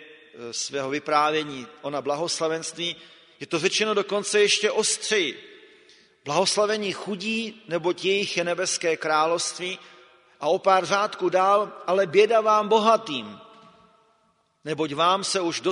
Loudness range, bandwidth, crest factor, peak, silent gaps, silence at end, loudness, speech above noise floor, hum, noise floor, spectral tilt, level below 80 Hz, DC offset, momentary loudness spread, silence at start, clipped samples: 5 LU; 11 kHz; 20 dB; -6 dBFS; none; 0 s; -23 LUFS; 43 dB; none; -66 dBFS; -2.5 dB/octave; -74 dBFS; under 0.1%; 13 LU; 0 s; under 0.1%